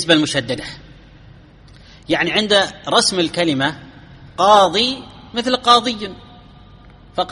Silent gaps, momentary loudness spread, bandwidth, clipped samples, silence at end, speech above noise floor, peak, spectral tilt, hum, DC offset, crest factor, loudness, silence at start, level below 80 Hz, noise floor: none; 17 LU; 11.5 kHz; under 0.1%; 0 s; 27 dB; 0 dBFS; -3 dB/octave; none; under 0.1%; 18 dB; -16 LUFS; 0 s; -48 dBFS; -43 dBFS